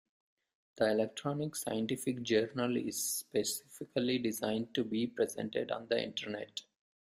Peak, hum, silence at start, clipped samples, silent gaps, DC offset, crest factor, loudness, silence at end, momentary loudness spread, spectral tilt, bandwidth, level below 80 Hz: -16 dBFS; none; 0.75 s; under 0.1%; none; under 0.1%; 20 dB; -35 LUFS; 0.45 s; 7 LU; -4 dB/octave; 15.5 kHz; -74 dBFS